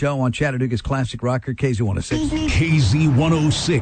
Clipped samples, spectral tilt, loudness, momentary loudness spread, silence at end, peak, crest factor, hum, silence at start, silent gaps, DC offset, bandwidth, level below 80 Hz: under 0.1%; -6 dB/octave; -19 LUFS; 6 LU; 0 s; -6 dBFS; 12 dB; none; 0 s; none; under 0.1%; 9.2 kHz; -34 dBFS